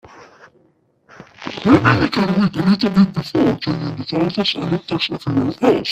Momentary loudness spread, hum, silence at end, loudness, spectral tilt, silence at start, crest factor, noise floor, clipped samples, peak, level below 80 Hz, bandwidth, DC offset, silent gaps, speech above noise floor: 9 LU; none; 0 s; -17 LUFS; -7 dB/octave; 0.15 s; 18 dB; -58 dBFS; under 0.1%; 0 dBFS; -48 dBFS; 9.2 kHz; under 0.1%; none; 42 dB